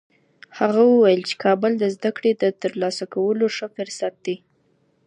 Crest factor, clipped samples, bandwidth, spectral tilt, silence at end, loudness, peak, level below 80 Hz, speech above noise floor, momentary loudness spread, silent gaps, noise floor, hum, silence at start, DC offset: 16 dB; under 0.1%; 11 kHz; -5.5 dB/octave; 0.7 s; -21 LUFS; -4 dBFS; -76 dBFS; 44 dB; 13 LU; none; -63 dBFS; none; 0.55 s; under 0.1%